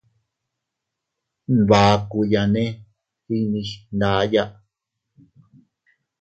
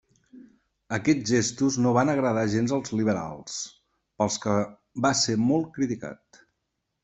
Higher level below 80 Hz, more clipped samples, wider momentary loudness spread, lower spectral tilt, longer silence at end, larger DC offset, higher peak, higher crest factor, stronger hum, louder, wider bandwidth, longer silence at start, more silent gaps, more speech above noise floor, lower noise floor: first, -48 dBFS vs -62 dBFS; neither; about the same, 14 LU vs 12 LU; first, -6.5 dB/octave vs -4.5 dB/octave; first, 1.7 s vs 0.9 s; neither; first, 0 dBFS vs -6 dBFS; about the same, 22 dB vs 20 dB; neither; first, -20 LUFS vs -25 LUFS; about the same, 8.2 kHz vs 8.4 kHz; first, 1.5 s vs 0.35 s; neither; first, 63 dB vs 55 dB; about the same, -82 dBFS vs -80 dBFS